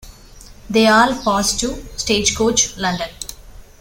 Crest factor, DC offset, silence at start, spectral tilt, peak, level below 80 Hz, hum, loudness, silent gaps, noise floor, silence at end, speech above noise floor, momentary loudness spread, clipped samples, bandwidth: 18 dB; under 0.1%; 0.05 s; -2.5 dB/octave; -2 dBFS; -38 dBFS; none; -16 LUFS; none; -41 dBFS; 0.15 s; 24 dB; 13 LU; under 0.1%; 17 kHz